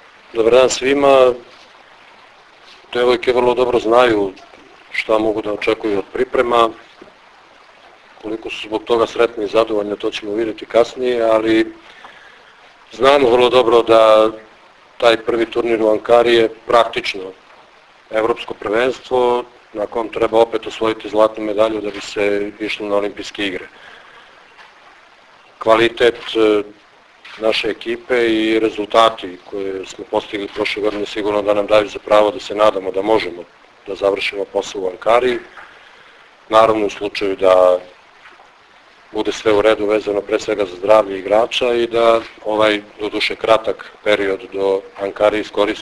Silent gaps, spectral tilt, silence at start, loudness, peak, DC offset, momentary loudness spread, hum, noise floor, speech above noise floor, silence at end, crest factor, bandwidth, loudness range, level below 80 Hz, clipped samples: none; -4 dB/octave; 0.35 s; -16 LUFS; 0 dBFS; under 0.1%; 12 LU; none; -47 dBFS; 31 dB; 0 s; 16 dB; 11 kHz; 6 LU; -50 dBFS; under 0.1%